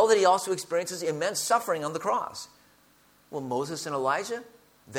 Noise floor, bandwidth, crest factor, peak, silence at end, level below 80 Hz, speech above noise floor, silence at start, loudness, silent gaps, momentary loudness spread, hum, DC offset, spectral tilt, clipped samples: -61 dBFS; 17.5 kHz; 18 dB; -10 dBFS; 0 s; -74 dBFS; 34 dB; 0 s; -28 LUFS; none; 15 LU; none; under 0.1%; -3 dB/octave; under 0.1%